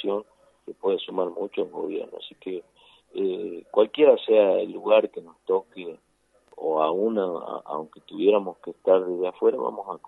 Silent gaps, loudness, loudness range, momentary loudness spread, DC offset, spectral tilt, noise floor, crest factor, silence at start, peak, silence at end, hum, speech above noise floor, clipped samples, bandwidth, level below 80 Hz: none; -24 LUFS; 8 LU; 18 LU; under 0.1%; -7.5 dB/octave; -60 dBFS; 20 dB; 0 s; -6 dBFS; 0.1 s; none; 35 dB; under 0.1%; 4.1 kHz; -76 dBFS